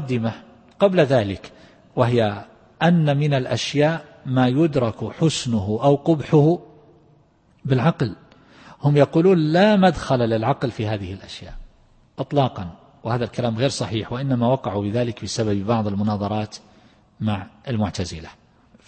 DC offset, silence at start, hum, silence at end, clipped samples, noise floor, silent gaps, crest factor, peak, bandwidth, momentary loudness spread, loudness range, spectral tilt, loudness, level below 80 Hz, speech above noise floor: under 0.1%; 0 s; none; 0.55 s; under 0.1%; -57 dBFS; none; 18 dB; -2 dBFS; 8.8 kHz; 14 LU; 6 LU; -6.5 dB/octave; -21 LUFS; -50 dBFS; 37 dB